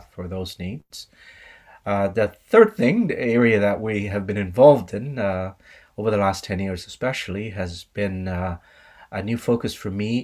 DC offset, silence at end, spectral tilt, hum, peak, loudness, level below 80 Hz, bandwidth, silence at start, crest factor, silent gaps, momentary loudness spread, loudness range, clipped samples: under 0.1%; 0 s; -6.5 dB/octave; none; -2 dBFS; -22 LUFS; -44 dBFS; 15.5 kHz; 0.15 s; 20 dB; none; 17 LU; 9 LU; under 0.1%